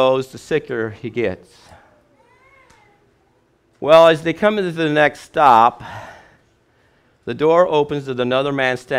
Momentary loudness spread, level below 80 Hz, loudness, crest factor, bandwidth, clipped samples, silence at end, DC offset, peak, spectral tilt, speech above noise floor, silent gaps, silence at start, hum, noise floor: 17 LU; -56 dBFS; -16 LUFS; 18 dB; 13 kHz; under 0.1%; 0 s; under 0.1%; 0 dBFS; -5.5 dB/octave; 43 dB; none; 0 s; none; -59 dBFS